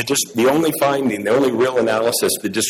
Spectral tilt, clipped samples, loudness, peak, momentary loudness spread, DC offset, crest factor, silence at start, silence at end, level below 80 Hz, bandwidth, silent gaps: -3.5 dB/octave; under 0.1%; -17 LUFS; -6 dBFS; 3 LU; under 0.1%; 10 dB; 0 s; 0 s; -58 dBFS; 16 kHz; none